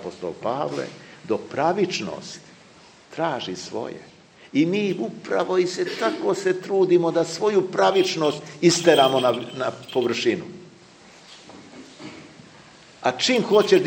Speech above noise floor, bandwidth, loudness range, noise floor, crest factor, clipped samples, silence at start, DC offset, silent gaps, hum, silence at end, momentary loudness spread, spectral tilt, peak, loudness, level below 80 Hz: 28 dB; 16 kHz; 9 LU; -50 dBFS; 20 dB; under 0.1%; 0 s; under 0.1%; none; none; 0 s; 22 LU; -4.5 dB/octave; -2 dBFS; -22 LUFS; -70 dBFS